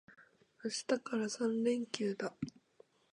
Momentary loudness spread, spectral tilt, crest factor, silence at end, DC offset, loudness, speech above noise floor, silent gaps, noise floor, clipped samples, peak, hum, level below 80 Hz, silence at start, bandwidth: 11 LU; -4 dB/octave; 22 dB; 0.65 s; under 0.1%; -38 LUFS; 31 dB; none; -67 dBFS; under 0.1%; -16 dBFS; none; -76 dBFS; 0.1 s; 11 kHz